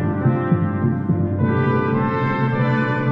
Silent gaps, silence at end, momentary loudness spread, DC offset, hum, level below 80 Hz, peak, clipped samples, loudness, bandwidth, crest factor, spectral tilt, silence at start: none; 0 s; 2 LU; under 0.1%; none; -48 dBFS; -6 dBFS; under 0.1%; -19 LUFS; 5.2 kHz; 12 dB; -10.5 dB/octave; 0 s